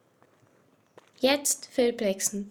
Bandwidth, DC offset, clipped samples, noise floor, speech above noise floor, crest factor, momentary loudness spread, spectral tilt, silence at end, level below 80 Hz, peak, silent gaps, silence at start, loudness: 19 kHz; under 0.1%; under 0.1%; -64 dBFS; 37 dB; 20 dB; 4 LU; -2 dB/octave; 0 s; -68 dBFS; -10 dBFS; none; 1.2 s; -26 LUFS